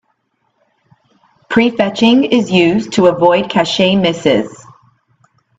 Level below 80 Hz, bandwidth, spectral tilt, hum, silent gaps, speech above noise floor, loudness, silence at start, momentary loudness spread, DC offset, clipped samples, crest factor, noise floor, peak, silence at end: -52 dBFS; 8 kHz; -5.5 dB/octave; none; none; 53 dB; -12 LUFS; 1.5 s; 4 LU; under 0.1%; under 0.1%; 14 dB; -64 dBFS; 0 dBFS; 1.05 s